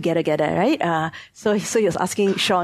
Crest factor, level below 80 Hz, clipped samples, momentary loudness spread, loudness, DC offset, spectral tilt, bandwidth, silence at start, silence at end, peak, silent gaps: 14 dB; -58 dBFS; under 0.1%; 5 LU; -21 LUFS; under 0.1%; -4.5 dB/octave; 13.5 kHz; 0 s; 0 s; -6 dBFS; none